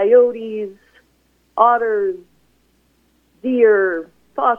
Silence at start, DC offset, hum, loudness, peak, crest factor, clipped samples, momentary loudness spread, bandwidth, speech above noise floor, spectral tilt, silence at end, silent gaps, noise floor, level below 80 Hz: 0 s; under 0.1%; none; -17 LUFS; 0 dBFS; 18 dB; under 0.1%; 17 LU; 3.5 kHz; 45 dB; -7 dB/octave; 0 s; none; -60 dBFS; -64 dBFS